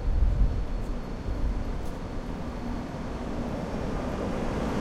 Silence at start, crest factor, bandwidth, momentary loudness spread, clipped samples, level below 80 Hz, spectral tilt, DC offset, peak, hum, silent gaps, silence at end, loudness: 0 s; 16 dB; 10.5 kHz; 7 LU; under 0.1%; -30 dBFS; -7.5 dB/octave; under 0.1%; -12 dBFS; none; none; 0 s; -33 LUFS